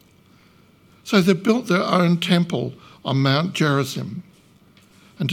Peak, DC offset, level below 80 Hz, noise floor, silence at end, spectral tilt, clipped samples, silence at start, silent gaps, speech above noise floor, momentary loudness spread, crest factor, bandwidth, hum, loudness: -2 dBFS; under 0.1%; -64 dBFS; -53 dBFS; 0 s; -6 dB/octave; under 0.1%; 1.05 s; none; 34 dB; 14 LU; 20 dB; 16 kHz; none; -20 LUFS